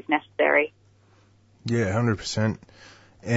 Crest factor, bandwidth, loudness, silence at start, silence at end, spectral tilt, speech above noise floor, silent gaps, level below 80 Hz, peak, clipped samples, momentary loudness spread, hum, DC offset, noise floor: 20 dB; 8 kHz; -24 LUFS; 0.1 s; 0 s; -6 dB/octave; 34 dB; none; -58 dBFS; -6 dBFS; under 0.1%; 17 LU; none; under 0.1%; -58 dBFS